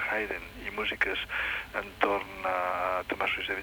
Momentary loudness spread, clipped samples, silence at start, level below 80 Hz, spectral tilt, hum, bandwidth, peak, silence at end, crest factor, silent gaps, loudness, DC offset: 6 LU; under 0.1%; 0 s; -54 dBFS; -4 dB/octave; none; over 20 kHz; -8 dBFS; 0 s; 24 dB; none; -31 LUFS; under 0.1%